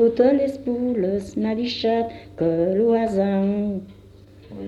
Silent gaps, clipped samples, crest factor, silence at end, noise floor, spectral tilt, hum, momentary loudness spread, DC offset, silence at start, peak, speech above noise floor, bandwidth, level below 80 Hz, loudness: none; under 0.1%; 16 dB; 0 s; -46 dBFS; -7.5 dB/octave; 50 Hz at -50 dBFS; 8 LU; under 0.1%; 0 s; -6 dBFS; 25 dB; 11.5 kHz; -52 dBFS; -22 LUFS